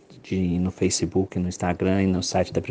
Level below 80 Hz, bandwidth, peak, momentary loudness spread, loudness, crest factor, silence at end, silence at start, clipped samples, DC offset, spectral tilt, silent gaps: -48 dBFS; 10 kHz; -8 dBFS; 4 LU; -24 LUFS; 16 dB; 0 s; 0.1 s; under 0.1%; under 0.1%; -5.5 dB/octave; none